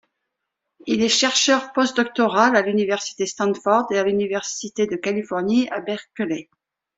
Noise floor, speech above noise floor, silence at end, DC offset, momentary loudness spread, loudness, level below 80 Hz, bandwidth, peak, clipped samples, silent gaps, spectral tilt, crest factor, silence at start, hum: -80 dBFS; 60 dB; 0.55 s; under 0.1%; 11 LU; -20 LUFS; -64 dBFS; 8.2 kHz; -2 dBFS; under 0.1%; none; -3 dB/octave; 20 dB; 0.85 s; none